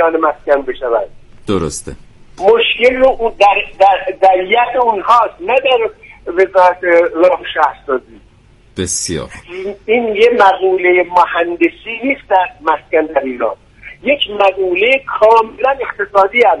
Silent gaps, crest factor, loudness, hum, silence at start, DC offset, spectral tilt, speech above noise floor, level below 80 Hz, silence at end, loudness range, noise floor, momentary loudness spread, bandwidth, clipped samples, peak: none; 12 dB; -12 LUFS; none; 0 s; under 0.1%; -3.5 dB/octave; 33 dB; -42 dBFS; 0 s; 4 LU; -45 dBFS; 11 LU; 11.5 kHz; under 0.1%; 0 dBFS